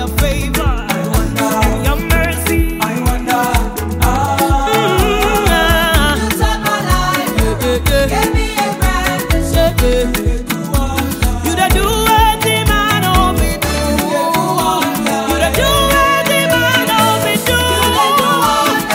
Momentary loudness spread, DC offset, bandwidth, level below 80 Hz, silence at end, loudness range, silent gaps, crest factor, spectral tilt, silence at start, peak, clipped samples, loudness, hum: 5 LU; under 0.1%; 16.5 kHz; -20 dBFS; 0 s; 3 LU; none; 12 dB; -4 dB/octave; 0 s; 0 dBFS; under 0.1%; -13 LUFS; none